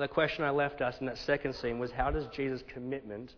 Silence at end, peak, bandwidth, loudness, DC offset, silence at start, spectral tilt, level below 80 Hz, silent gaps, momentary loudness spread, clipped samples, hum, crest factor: 0 s; -14 dBFS; 5.4 kHz; -34 LUFS; under 0.1%; 0 s; -6.5 dB/octave; -48 dBFS; none; 9 LU; under 0.1%; none; 18 dB